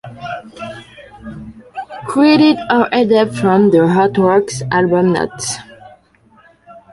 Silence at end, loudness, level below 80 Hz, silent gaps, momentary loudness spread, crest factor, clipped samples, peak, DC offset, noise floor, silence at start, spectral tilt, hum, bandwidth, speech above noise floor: 0.15 s; -13 LUFS; -50 dBFS; none; 21 LU; 14 dB; under 0.1%; -2 dBFS; under 0.1%; -50 dBFS; 0.05 s; -5.5 dB/octave; none; 11.5 kHz; 38 dB